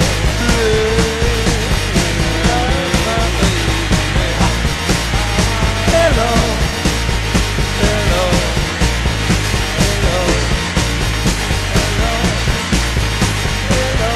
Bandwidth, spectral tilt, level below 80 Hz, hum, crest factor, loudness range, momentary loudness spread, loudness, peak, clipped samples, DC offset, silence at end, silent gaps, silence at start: 13.5 kHz; -4 dB/octave; -20 dBFS; none; 14 dB; 1 LU; 3 LU; -15 LUFS; 0 dBFS; under 0.1%; under 0.1%; 0 s; none; 0 s